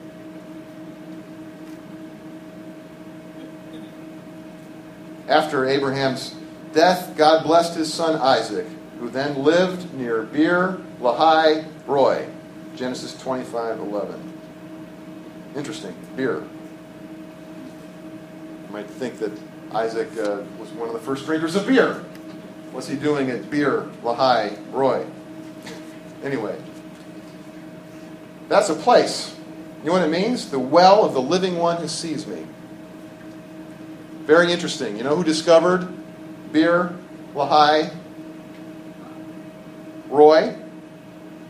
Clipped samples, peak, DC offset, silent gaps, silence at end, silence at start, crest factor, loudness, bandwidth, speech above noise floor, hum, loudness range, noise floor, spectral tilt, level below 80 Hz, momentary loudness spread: under 0.1%; 0 dBFS; under 0.1%; none; 0 s; 0 s; 22 dB; -20 LUFS; 15 kHz; 21 dB; none; 13 LU; -40 dBFS; -5 dB/octave; -64 dBFS; 23 LU